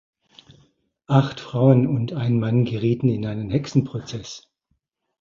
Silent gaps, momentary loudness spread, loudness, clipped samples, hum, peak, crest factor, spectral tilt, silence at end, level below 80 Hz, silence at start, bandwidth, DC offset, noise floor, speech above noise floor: none; 15 LU; -21 LUFS; under 0.1%; none; -2 dBFS; 20 dB; -8 dB/octave; 0.8 s; -54 dBFS; 1.1 s; 7.4 kHz; under 0.1%; -73 dBFS; 52 dB